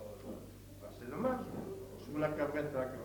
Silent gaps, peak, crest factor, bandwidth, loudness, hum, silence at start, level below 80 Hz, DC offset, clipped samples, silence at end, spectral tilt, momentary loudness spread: none; -22 dBFS; 18 dB; 19 kHz; -40 LUFS; none; 0 s; -60 dBFS; under 0.1%; under 0.1%; 0 s; -7 dB/octave; 15 LU